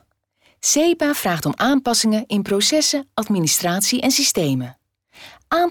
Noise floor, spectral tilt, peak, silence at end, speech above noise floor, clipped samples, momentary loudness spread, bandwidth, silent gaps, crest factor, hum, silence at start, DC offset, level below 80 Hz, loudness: -61 dBFS; -3 dB/octave; -8 dBFS; 0 s; 42 dB; under 0.1%; 7 LU; over 20 kHz; none; 12 dB; none; 0.65 s; under 0.1%; -56 dBFS; -18 LUFS